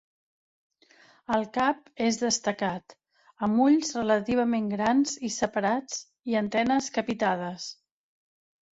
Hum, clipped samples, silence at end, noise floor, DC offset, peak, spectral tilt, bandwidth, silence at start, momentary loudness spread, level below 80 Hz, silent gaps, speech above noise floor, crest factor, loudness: none; under 0.1%; 1 s; -59 dBFS; under 0.1%; -10 dBFS; -4 dB/octave; 8 kHz; 1.3 s; 10 LU; -64 dBFS; none; 33 dB; 18 dB; -27 LUFS